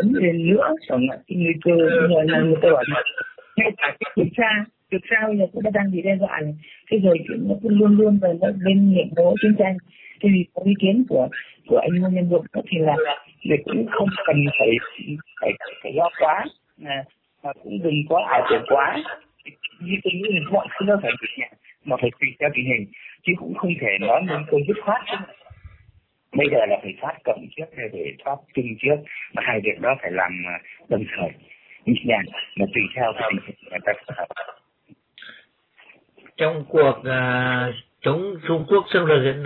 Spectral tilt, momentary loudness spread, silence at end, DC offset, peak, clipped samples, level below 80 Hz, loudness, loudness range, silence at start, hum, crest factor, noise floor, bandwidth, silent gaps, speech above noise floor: -10.5 dB/octave; 13 LU; 0 s; under 0.1%; -4 dBFS; under 0.1%; -60 dBFS; -21 LUFS; 7 LU; 0 s; none; 16 dB; -57 dBFS; 4.3 kHz; none; 36 dB